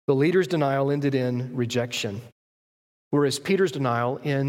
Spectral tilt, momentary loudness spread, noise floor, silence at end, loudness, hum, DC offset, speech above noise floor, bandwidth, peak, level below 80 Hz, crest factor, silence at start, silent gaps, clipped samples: -6 dB/octave; 7 LU; under -90 dBFS; 0 s; -24 LUFS; none; under 0.1%; over 66 dB; 16.5 kHz; -10 dBFS; -68 dBFS; 16 dB; 0.1 s; 2.32-3.11 s; under 0.1%